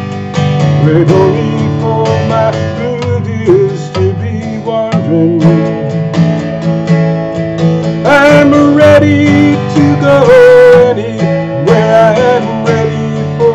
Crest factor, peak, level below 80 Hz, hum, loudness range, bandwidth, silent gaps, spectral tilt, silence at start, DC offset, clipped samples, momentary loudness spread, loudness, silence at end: 8 dB; 0 dBFS; -40 dBFS; none; 6 LU; 9.2 kHz; none; -7.5 dB/octave; 0 s; under 0.1%; 5%; 10 LU; -9 LUFS; 0 s